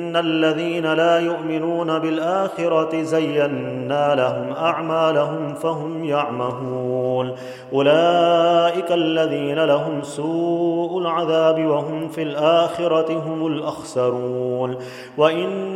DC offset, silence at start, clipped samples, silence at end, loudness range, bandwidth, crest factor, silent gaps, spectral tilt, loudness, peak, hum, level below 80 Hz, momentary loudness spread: under 0.1%; 0 s; under 0.1%; 0 s; 3 LU; 12.5 kHz; 18 dB; none; -6 dB/octave; -20 LUFS; -2 dBFS; none; -68 dBFS; 8 LU